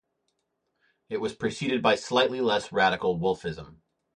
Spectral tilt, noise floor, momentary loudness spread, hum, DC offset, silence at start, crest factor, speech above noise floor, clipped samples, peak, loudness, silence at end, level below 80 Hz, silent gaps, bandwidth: -4.5 dB/octave; -78 dBFS; 10 LU; none; under 0.1%; 1.1 s; 18 dB; 52 dB; under 0.1%; -10 dBFS; -26 LUFS; 0.45 s; -60 dBFS; none; 10.5 kHz